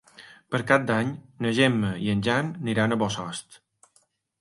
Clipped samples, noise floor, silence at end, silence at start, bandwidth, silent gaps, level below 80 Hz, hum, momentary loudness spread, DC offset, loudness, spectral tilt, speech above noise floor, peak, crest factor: under 0.1%; -66 dBFS; 0.85 s; 0.2 s; 11.5 kHz; none; -58 dBFS; none; 10 LU; under 0.1%; -25 LUFS; -5.5 dB/octave; 42 dB; -4 dBFS; 22 dB